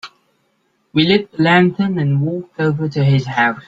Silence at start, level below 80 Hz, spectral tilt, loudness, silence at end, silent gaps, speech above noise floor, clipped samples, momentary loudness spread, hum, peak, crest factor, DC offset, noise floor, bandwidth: 0.05 s; -54 dBFS; -7.5 dB/octave; -16 LUFS; 0.05 s; none; 48 dB; under 0.1%; 7 LU; none; -2 dBFS; 16 dB; under 0.1%; -63 dBFS; 7.8 kHz